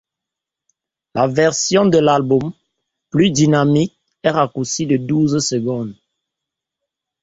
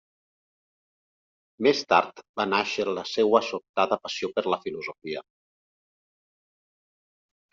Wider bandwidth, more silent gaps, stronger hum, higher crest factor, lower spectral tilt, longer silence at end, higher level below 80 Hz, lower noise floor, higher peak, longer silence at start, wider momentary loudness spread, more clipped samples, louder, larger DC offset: about the same, 8 kHz vs 7.6 kHz; second, none vs 2.29-2.34 s, 3.69-3.74 s; neither; second, 16 dB vs 24 dB; first, -5 dB/octave vs -2 dB/octave; second, 1.3 s vs 2.3 s; first, -54 dBFS vs -72 dBFS; second, -84 dBFS vs under -90 dBFS; about the same, -2 dBFS vs -4 dBFS; second, 1.15 s vs 1.6 s; second, 10 LU vs 13 LU; neither; first, -16 LUFS vs -26 LUFS; neither